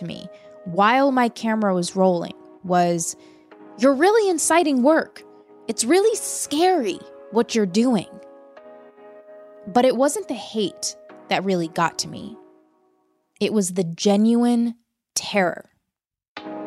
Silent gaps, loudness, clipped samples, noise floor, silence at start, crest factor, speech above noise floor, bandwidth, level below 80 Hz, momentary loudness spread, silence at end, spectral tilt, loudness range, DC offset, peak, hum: 16.28-16.35 s; -21 LUFS; under 0.1%; -82 dBFS; 0 s; 16 dB; 62 dB; 15.5 kHz; -70 dBFS; 19 LU; 0 s; -4 dB/octave; 5 LU; under 0.1%; -6 dBFS; none